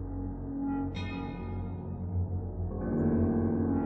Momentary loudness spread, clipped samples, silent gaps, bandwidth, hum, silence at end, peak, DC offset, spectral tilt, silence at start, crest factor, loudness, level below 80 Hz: 10 LU; under 0.1%; none; 6 kHz; none; 0 s; -18 dBFS; under 0.1%; -10 dB/octave; 0 s; 14 dB; -33 LUFS; -44 dBFS